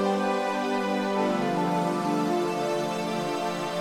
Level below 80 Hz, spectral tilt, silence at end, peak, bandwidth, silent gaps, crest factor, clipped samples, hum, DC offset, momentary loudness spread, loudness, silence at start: -70 dBFS; -5.5 dB/octave; 0 s; -12 dBFS; 16 kHz; none; 14 dB; under 0.1%; none; under 0.1%; 3 LU; -27 LUFS; 0 s